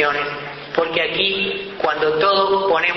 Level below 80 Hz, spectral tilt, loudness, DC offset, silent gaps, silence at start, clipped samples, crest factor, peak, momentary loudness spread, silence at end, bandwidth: -54 dBFS; -5 dB/octave; -18 LUFS; under 0.1%; none; 0 s; under 0.1%; 14 dB; -4 dBFS; 8 LU; 0 s; 6.2 kHz